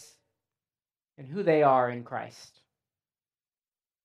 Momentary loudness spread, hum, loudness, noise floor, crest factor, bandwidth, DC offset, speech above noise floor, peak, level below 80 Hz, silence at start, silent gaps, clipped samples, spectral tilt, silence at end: 17 LU; none; -26 LUFS; under -90 dBFS; 22 dB; 12 kHz; under 0.1%; over 63 dB; -8 dBFS; -86 dBFS; 1.2 s; none; under 0.1%; -7 dB/octave; 1.6 s